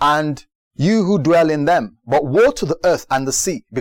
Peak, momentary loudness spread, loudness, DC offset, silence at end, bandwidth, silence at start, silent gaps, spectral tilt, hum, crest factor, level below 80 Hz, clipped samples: -6 dBFS; 6 LU; -17 LUFS; under 0.1%; 0 s; 17 kHz; 0 s; 0.55-0.71 s; -5 dB/octave; none; 10 dB; -46 dBFS; under 0.1%